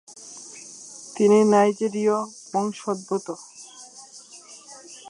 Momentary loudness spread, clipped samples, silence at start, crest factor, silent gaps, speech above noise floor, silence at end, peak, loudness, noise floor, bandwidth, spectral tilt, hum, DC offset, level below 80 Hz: 24 LU; under 0.1%; 0.1 s; 20 dB; none; 25 dB; 0.15 s; -4 dBFS; -22 LUFS; -46 dBFS; 11 kHz; -5 dB/octave; none; under 0.1%; -78 dBFS